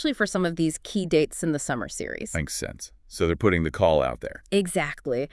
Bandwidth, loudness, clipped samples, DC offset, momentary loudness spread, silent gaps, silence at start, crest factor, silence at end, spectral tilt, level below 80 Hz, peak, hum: 12 kHz; -26 LUFS; under 0.1%; under 0.1%; 10 LU; none; 0 s; 18 dB; 0.05 s; -5 dB/octave; -46 dBFS; -6 dBFS; none